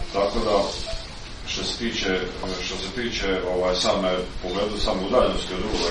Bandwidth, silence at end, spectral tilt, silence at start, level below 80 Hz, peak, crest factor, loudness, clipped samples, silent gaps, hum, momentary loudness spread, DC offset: 11 kHz; 0 s; -4 dB/octave; 0 s; -36 dBFS; -6 dBFS; 18 dB; -25 LUFS; under 0.1%; none; none; 9 LU; under 0.1%